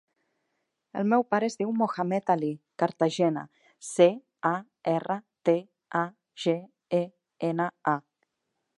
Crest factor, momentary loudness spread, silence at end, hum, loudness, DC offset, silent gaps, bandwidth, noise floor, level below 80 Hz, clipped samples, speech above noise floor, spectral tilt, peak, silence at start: 22 dB; 10 LU; 0.8 s; none; -28 LUFS; under 0.1%; none; 11.5 kHz; -81 dBFS; -82 dBFS; under 0.1%; 55 dB; -6 dB/octave; -6 dBFS; 0.95 s